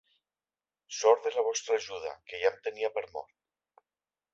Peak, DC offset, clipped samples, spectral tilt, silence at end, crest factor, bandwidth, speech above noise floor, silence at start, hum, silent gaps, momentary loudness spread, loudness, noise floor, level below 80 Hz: -10 dBFS; under 0.1%; under 0.1%; 0 dB/octave; 1.1 s; 24 dB; 7.8 kHz; over 60 dB; 0.9 s; 50 Hz at -90 dBFS; none; 15 LU; -30 LUFS; under -90 dBFS; -76 dBFS